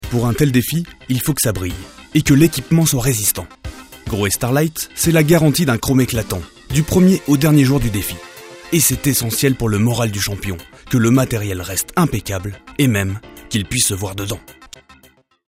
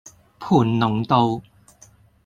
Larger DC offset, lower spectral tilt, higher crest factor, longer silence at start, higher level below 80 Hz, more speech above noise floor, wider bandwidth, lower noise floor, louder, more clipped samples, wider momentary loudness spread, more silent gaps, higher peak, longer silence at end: neither; second, -5 dB/octave vs -7.5 dB/octave; about the same, 16 dB vs 20 dB; second, 0 s vs 0.4 s; first, -36 dBFS vs -54 dBFS; about the same, 36 dB vs 34 dB; first, 16.5 kHz vs 9.6 kHz; about the same, -52 dBFS vs -52 dBFS; first, -17 LUFS vs -20 LUFS; neither; about the same, 13 LU vs 12 LU; neither; about the same, 0 dBFS vs -2 dBFS; about the same, 0.9 s vs 0.85 s